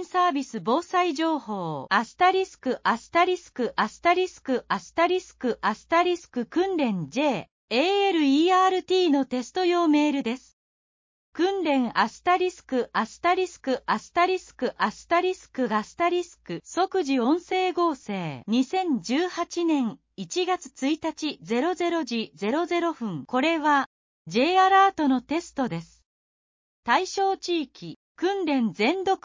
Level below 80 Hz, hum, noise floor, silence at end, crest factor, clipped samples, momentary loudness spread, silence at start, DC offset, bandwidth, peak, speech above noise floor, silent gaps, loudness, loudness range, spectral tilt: -66 dBFS; none; under -90 dBFS; 0.1 s; 18 dB; under 0.1%; 9 LU; 0 s; under 0.1%; 7.6 kHz; -8 dBFS; over 65 dB; 7.51-7.68 s, 10.53-11.33 s, 23.86-24.25 s, 26.06-26.83 s, 27.96-28.15 s; -25 LUFS; 4 LU; -4.5 dB/octave